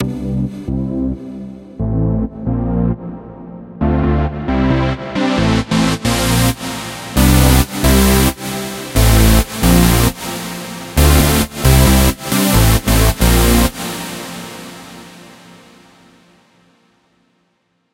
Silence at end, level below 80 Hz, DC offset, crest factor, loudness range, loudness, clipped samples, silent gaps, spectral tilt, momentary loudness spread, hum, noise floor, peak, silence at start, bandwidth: 2.65 s; -20 dBFS; under 0.1%; 14 dB; 8 LU; -14 LUFS; under 0.1%; none; -5 dB/octave; 17 LU; none; -63 dBFS; 0 dBFS; 0 s; 17 kHz